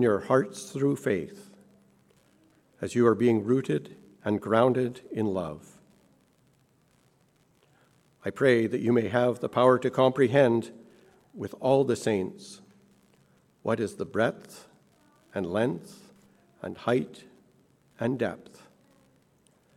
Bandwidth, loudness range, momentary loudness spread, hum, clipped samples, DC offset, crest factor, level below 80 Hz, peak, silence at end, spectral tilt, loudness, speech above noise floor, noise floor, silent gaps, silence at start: 14 kHz; 10 LU; 17 LU; none; under 0.1%; under 0.1%; 22 dB; -70 dBFS; -6 dBFS; 1.4 s; -6.5 dB/octave; -27 LUFS; 40 dB; -66 dBFS; none; 0 s